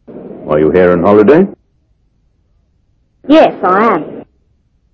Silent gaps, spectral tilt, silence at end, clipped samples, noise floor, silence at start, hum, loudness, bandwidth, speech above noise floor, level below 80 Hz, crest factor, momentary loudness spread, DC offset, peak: none; -8.5 dB/octave; 0.7 s; 1%; -56 dBFS; 0.1 s; none; -9 LUFS; 6.4 kHz; 48 dB; -42 dBFS; 12 dB; 22 LU; under 0.1%; 0 dBFS